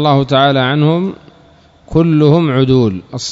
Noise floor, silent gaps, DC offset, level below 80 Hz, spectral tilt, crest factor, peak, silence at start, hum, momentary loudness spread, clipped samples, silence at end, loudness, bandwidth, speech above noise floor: -45 dBFS; none; under 0.1%; -42 dBFS; -7 dB/octave; 12 dB; 0 dBFS; 0 s; none; 7 LU; 0.2%; 0 s; -12 LUFS; 7.8 kHz; 34 dB